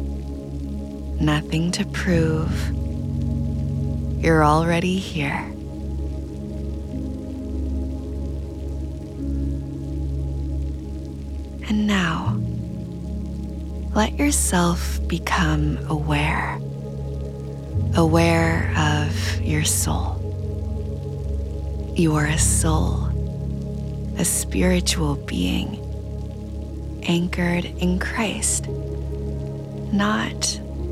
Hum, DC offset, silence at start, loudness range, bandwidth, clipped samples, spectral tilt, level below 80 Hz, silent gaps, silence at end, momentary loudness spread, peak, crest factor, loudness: none; under 0.1%; 0 s; 8 LU; 15.5 kHz; under 0.1%; -5 dB/octave; -30 dBFS; none; 0 s; 12 LU; -4 dBFS; 18 dB; -23 LUFS